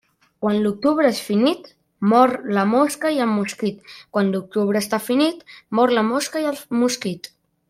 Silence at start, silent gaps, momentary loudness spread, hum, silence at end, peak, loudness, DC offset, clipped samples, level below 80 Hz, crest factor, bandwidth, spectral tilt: 0.4 s; none; 9 LU; none; 0.5 s; -2 dBFS; -20 LUFS; under 0.1%; under 0.1%; -66 dBFS; 18 dB; 16 kHz; -5 dB/octave